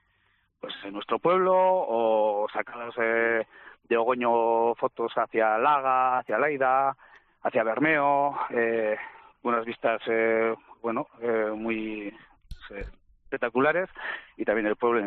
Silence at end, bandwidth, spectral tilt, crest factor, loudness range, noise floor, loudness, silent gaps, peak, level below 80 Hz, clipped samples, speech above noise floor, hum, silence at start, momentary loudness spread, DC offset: 0 s; 4.4 kHz; -3 dB/octave; 16 dB; 5 LU; -69 dBFS; -26 LUFS; none; -10 dBFS; -58 dBFS; under 0.1%; 43 dB; none; 0.65 s; 14 LU; under 0.1%